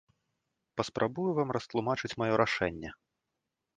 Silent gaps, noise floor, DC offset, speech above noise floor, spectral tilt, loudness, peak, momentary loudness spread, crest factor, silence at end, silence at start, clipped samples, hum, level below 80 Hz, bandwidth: none; -86 dBFS; under 0.1%; 54 dB; -6 dB/octave; -32 LUFS; -10 dBFS; 11 LU; 24 dB; 0.85 s; 0.75 s; under 0.1%; none; -60 dBFS; 9.6 kHz